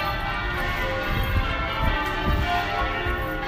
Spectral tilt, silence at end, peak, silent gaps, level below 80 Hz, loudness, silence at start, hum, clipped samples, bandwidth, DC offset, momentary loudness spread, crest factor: -5.5 dB/octave; 0 s; -8 dBFS; none; -30 dBFS; -25 LUFS; 0 s; none; under 0.1%; 15.5 kHz; under 0.1%; 2 LU; 16 dB